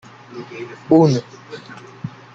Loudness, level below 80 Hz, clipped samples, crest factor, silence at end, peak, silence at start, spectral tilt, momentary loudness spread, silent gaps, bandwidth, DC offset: -15 LUFS; -60 dBFS; under 0.1%; 20 dB; 0.25 s; 0 dBFS; 0.3 s; -7.5 dB/octave; 23 LU; none; 7.6 kHz; under 0.1%